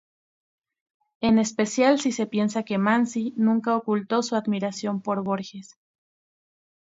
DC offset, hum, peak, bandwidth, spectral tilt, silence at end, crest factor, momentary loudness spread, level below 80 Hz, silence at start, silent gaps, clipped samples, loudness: under 0.1%; none; -6 dBFS; 8 kHz; -5 dB/octave; 1.2 s; 18 dB; 8 LU; -64 dBFS; 1.2 s; none; under 0.1%; -24 LUFS